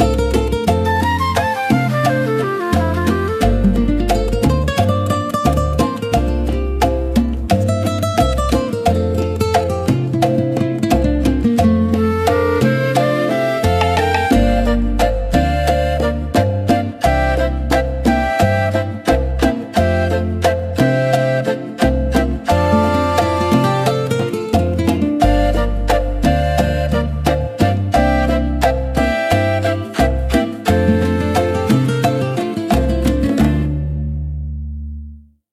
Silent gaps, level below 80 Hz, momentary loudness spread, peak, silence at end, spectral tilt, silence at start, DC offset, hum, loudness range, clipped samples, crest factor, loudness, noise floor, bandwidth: none; -24 dBFS; 4 LU; -2 dBFS; 0.35 s; -6.5 dB/octave; 0 s; under 0.1%; none; 2 LU; under 0.1%; 14 dB; -16 LUFS; -36 dBFS; 15.5 kHz